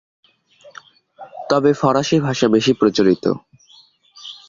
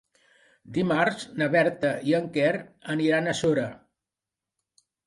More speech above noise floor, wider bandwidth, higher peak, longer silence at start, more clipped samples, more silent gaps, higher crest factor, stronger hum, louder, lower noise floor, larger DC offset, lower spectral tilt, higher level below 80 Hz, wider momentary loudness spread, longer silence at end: second, 35 dB vs 64 dB; second, 7.6 kHz vs 11.5 kHz; first, -2 dBFS vs -8 dBFS; about the same, 0.65 s vs 0.65 s; neither; neither; about the same, 16 dB vs 18 dB; neither; first, -17 LUFS vs -25 LUFS; second, -51 dBFS vs -89 dBFS; neither; about the same, -5.5 dB/octave vs -5.5 dB/octave; first, -56 dBFS vs -66 dBFS; first, 20 LU vs 9 LU; second, 0.15 s vs 1.3 s